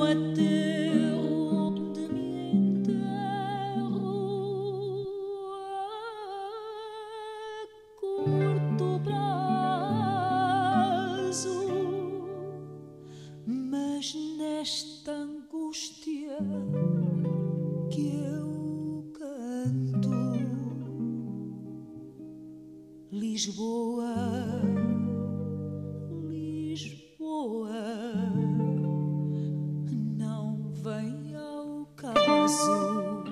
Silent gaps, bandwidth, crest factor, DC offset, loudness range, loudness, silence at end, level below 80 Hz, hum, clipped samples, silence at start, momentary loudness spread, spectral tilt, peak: none; 13 kHz; 18 dB; under 0.1%; 7 LU; -31 LUFS; 0 s; -68 dBFS; none; under 0.1%; 0 s; 14 LU; -6 dB/octave; -12 dBFS